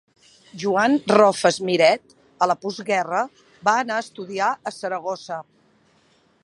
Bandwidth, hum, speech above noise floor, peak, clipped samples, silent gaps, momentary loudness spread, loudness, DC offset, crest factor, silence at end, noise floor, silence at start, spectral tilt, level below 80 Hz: 11.5 kHz; none; 39 dB; 0 dBFS; under 0.1%; none; 13 LU; -21 LUFS; under 0.1%; 22 dB; 1 s; -60 dBFS; 0.55 s; -4 dB/octave; -70 dBFS